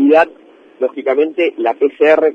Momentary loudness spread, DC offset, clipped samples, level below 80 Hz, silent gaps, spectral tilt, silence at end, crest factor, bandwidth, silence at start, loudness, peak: 8 LU; under 0.1%; under 0.1%; -64 dBFS; none; -5.5 dB/octave; 0 s; 14 dB; 6.4 kHz; 0 s; -15 LUFS; 0 dBFS